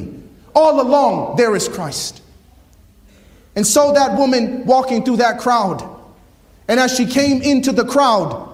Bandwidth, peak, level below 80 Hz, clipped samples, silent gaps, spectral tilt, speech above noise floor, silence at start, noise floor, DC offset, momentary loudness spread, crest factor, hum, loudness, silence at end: 16 kHz; 0 dBFS; -48 dBFS; under 0.1%; none; -4 dB/octave; 33 dB; 0 s; -47 dBFS; under 0.1%; 11 LU; 16 dB; none; -15 LUFS; 0 s